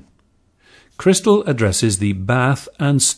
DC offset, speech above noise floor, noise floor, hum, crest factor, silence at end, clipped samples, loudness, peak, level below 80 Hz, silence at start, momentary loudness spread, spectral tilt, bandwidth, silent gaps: under 0.1%; 43 dB; -59 dBFS; none; 16 dB; 0 s; under 0.1%; -17 LUFS; -2 dBFS; -48 dBFS; 1 s; 5 LU; -4.5 dB/octave; 11 kHz; none